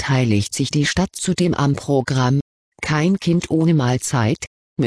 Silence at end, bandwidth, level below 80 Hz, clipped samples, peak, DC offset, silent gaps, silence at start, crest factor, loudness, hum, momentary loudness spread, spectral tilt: 0 s; 11 kHz; -44 dBFS; under 0.1%; -4 dBFS; 0.1%; 2.41-2.72 s, 4.47-4.76 s; 0 s; 14 dB; -19 LUFS; none; 5 LU; -5.5 dB/octave